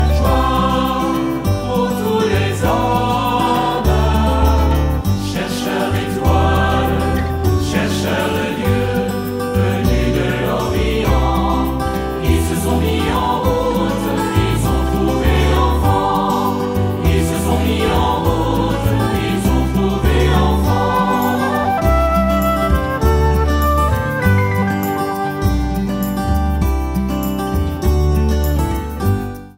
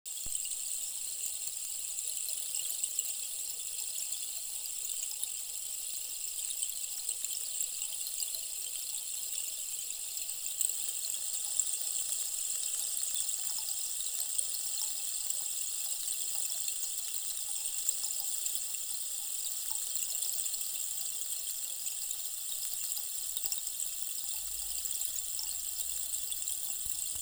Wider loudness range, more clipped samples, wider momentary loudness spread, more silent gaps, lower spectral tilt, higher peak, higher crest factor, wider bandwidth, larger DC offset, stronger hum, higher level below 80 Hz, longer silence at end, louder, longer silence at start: about the same, 2 LU vs 3 LU; neither; about the same, 5 LU vs 4 LU; neither; first, -6.5 dB/octave vs 3.5 dB/octave; first, -2 dBFS vs -12 dBFS; second, 14 dB vs 24 dB; second, 16.5 kHz vs over 20 kHz; neither; neither; first, -22 dBFS vs -68 dBFS; about the same, 0.05 s vs 0 s; first, -16 LUFS vs -33 LUFS; about the same, 0 s vs 0.05 s